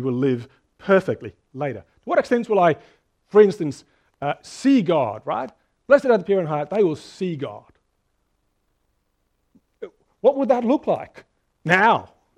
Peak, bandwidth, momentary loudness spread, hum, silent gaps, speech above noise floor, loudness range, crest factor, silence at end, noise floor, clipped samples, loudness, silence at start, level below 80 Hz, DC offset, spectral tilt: 0 dBFS; 10.5 kHz; 19 LU; none; none; 50 dB; 8 LU; 22 dB; 0.3 s; -70 dBFS; under 0.1%; -21 LUFS; 0 s; -64 dBFS; under 0.1%; -6.5 dB/octave